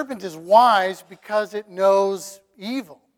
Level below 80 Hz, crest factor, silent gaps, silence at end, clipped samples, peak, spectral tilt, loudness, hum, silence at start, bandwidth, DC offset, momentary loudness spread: -74 dBFS; 18 dB; none; 0.25 s; under 0.1%; -2 dBFS; -4 dB/octave; -20 LUFS; none; 0 s; 17.5 kHz; under 0.1%; 18 LU